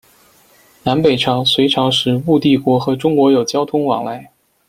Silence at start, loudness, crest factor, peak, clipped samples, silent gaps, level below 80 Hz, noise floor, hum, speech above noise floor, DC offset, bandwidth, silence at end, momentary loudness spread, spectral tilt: 0.85 s; -14 LUFS; 14 dB; -2 dBFS; under 0.1%; none; -52 dBFS; -50 dBFS; none; 36 dB; under 0.1%; 15.5 kHz; 0.45 s; 7 LU; -5.5 dB/octave